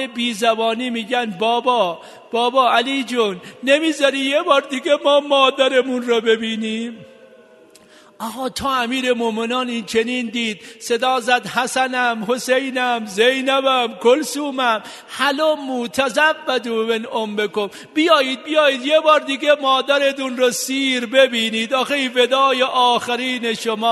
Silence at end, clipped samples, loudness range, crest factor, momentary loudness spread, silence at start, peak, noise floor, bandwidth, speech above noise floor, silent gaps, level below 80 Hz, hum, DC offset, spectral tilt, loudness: 0 s; under 0.1%; 5 LU; 18 dB; 8 LU; 0 s; 0 dBFS; -47 dBFS; 12.5 kHz; 29 dB; none; -64 dBFS; none; under 0.1%; -2.5 dB/octave; -18 LUFS